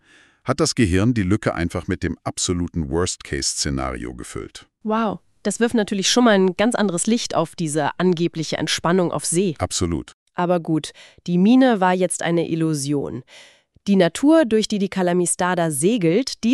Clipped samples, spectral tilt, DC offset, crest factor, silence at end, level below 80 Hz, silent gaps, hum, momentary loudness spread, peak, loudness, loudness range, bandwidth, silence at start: under 0.1%; -4.5 dB/octave; under 0.1%; 16 dB; 0 s; -44 dBFS; 10.14-10.26 s; none; 12 LU; -4 dBFS; -20 LUFS; 5 LU; 13.5 kHz; 0.45 s